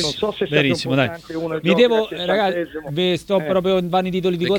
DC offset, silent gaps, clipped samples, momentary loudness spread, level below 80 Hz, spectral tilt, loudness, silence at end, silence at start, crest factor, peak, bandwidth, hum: under 0.1%; none; under 0.1%; 7 LU; -52 dBFS; -5.5 dB/octave; -19 LUFS; 0 s; 0 s; 16 dB; -2 dBFS; 18 kHz; none